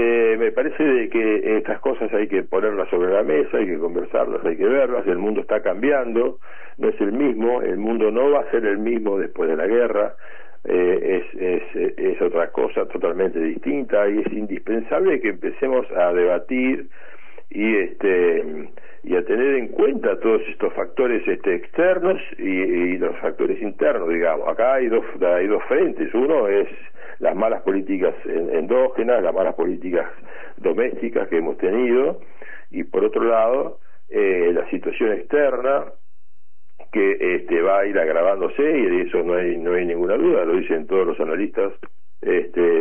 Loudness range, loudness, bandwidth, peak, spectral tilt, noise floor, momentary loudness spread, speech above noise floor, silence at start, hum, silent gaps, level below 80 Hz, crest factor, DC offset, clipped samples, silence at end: 2 LU; -21 LUFS; 3.5 kHz; -6 dBFS; -9 dB/octave; -64 dBFS; 7 LU; 44 dB; 0 s; none; none; -64 dBFS; 14 dB; 4%; under 0.1%; 0 s